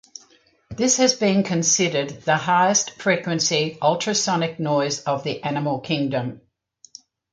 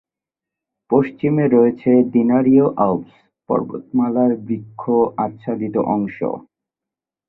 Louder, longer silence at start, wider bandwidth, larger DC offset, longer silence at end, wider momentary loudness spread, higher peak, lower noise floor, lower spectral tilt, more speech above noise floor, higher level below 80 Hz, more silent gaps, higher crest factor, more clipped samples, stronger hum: second, -21 LUFS vs -18 LUFS; second, 0.7 s vs 0.9 s; first, 10.5 kHz vs 3.9 kHz; neither; about the same, 0.95 s vs 0.9 s; second, 8 LU vs 11 LU; about the same, -4 dBFS vs -2 dBFS; second, -57 dBFS vs -87 dBFS; second, -3.5 dB/octave vs -12.5 dB/octave; second, 36 dB vs 70 dB; about the same, -62 dBFS vs -58 dBFS; neither; about the same, 18 dB vs 16 dB; neither; neither